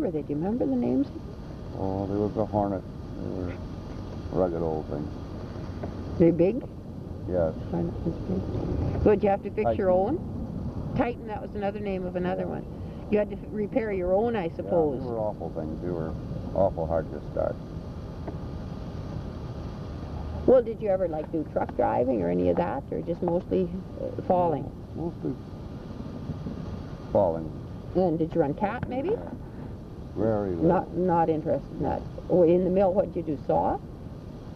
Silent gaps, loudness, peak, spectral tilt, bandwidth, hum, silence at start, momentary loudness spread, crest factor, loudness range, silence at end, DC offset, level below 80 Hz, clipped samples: none; -28 LUFS; -8 dBFS; -9.5 dB/octave; 6.8 kHz; none; 0 s; 14 LU; 20 dB; 6 LU; 0 s; under 0.1%; -44 dBFS; under 0.1%